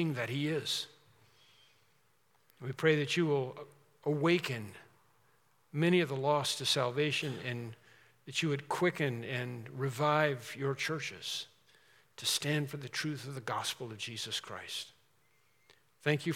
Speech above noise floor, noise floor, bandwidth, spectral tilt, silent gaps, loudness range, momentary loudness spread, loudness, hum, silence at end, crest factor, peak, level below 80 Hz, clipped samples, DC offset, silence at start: 39 dB; -73 dBFS; 17 kHz; -4.5 dB/octave; none; 4 LU; 12 LU; -34 LUFS; none; 0 s; 22 dB; -14 dBFS; -84 dBFS; under 0.1%; under 0.1%; 0 s